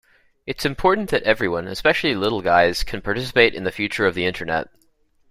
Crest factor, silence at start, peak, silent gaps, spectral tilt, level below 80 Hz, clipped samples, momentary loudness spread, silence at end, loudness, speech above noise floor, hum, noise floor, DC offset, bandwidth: 20 dB; 0.45 s; -2 dBFS; none; -4.5 dB/octave; -40 dBFS; under 0.1%; 9 LU; 0.65 s; -20 LUFS; 40 dB; none; -60 dBFS; under 0.1%; 16 kHz